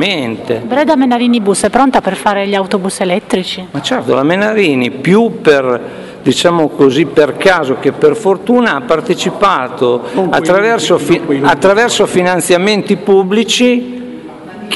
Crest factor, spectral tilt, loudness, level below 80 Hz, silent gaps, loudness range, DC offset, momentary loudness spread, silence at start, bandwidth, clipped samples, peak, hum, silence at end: 12 dB; -4.5 dB/octave; -11 LUFS; -48 dBFS; none; 2 LU; under 0.1%; 7 LU; 0 s; 12 kHz; 0.3%; 0 dBFS; none; 0 s